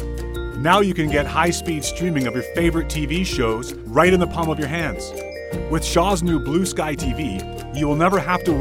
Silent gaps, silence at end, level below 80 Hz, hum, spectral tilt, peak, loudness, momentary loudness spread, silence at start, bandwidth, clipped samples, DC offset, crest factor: none; 0 s; -32 dBFS; none; -5 dB/octave; 0 dBFS; -21 LUFS; 12 LU; 0 s; 17 kHz; under 0.1%; under 0.1%; 20 dB